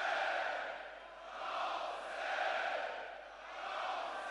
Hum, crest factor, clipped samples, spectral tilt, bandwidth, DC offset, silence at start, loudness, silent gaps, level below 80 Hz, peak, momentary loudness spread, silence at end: none; 16 dB; under 0.1%; -1 dB/octave; 11.5 kHz; under 0.1%; 0 s; -40 LUFS; none; -74 dBFS; -24 dBFS; 13 LU; 0 s